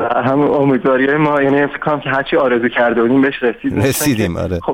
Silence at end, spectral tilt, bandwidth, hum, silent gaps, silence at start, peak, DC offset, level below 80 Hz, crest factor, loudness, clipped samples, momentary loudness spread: 0 s; -5.5 dB/octave; 18.5 kHz; none; none; 0 s; -2 dBFS; under 0.1%; -42 dBFS; 12 dB; -14 LUFS; under 0.1%; 5 LU